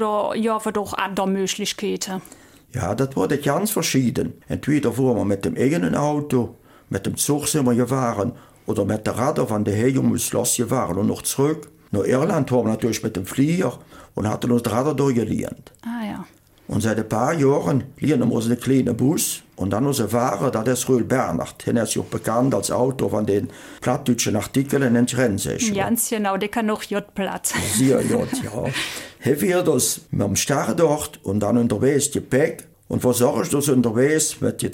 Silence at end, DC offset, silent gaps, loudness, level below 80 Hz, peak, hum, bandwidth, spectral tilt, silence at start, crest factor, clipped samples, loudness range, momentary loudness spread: 0 s; under 0.1%; none; -21 LUFS; -52 dBFS; -4 dBFS; none; 17 kHz; -5 dB/octave; 0 s; 16 dB; under 0.1%; 3 LU; 8 LU